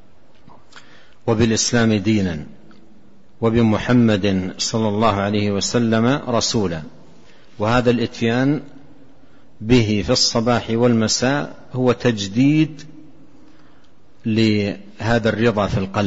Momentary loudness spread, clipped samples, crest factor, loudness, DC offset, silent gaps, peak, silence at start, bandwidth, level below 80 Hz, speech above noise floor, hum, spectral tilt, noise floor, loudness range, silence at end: 9 LU; under 0.1%; 16 dB; -18 LUFS; 1%; none; -4 dBFS; 0.75 s; 8 kHz; -44 dBFS; 35 dB; none; -5 dB/octave; -53 dBFS; 4 LU; 0 s